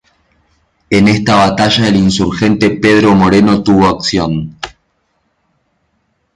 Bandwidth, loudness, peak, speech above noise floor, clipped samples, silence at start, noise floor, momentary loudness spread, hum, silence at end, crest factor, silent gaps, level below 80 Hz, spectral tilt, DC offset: 11 kHz; -10 LUFS; 0 dBFS; 53 dB; under 0.1%; 0.9 s; -62 dBFS; 10 LU; none; 1.65 s; 12 dB; none; -36 dBFS; -5.5 dB/octave; under 0.1%